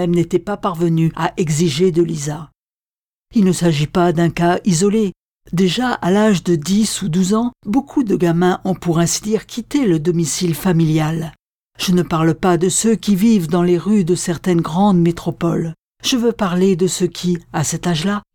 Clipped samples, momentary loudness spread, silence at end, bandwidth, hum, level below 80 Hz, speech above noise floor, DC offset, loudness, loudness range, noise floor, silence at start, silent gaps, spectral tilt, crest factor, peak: under 0.1%; 7 LU; 0.15 s; 18 kHz; none; -46 dBFS; over 74 dB; under 0.1%; -17 LUFS; 2 LU; under -90 dBFS; 0 s; 2.55-3.26 s, 5.16-5.41 s, 11.39-11.71 s, 15.79-15.95 s; -5.5 dB/octave; 14 dB; -2 dBFS